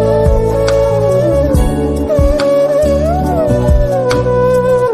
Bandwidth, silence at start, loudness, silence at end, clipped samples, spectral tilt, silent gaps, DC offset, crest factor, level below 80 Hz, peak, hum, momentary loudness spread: 15 kHz; 0 s; -12 LUFS; 0 s; under 0.1%; -7 dB/octave; none; under 0.1%; 10 dB; -18 dBFS; 0 dBFS; none; 2 LU